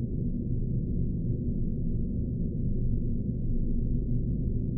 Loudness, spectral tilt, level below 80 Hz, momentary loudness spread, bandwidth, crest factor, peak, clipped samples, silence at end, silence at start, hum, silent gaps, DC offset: -32 LUFS; -10.5 dB/octave; -30 dBFS; 1 LU; 0.7 kHz; 12 dB; -16 dBFS; under 0.1%; 0 s; 0 s; none; none; under 0.1%